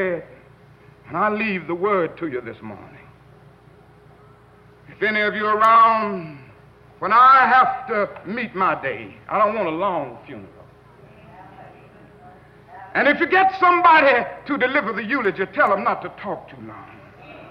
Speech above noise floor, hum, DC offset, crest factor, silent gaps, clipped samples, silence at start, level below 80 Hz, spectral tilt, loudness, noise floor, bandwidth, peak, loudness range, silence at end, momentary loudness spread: 30 dB; none; under 0.1%; 16 dB; none; under 0.1%; 0 s; -60 dBFS; -6.5 dB/octave; -18 LUFS; -49 dBFS; 7 kHz; -4 dBFS; 12 LU; 0 s; 22 LU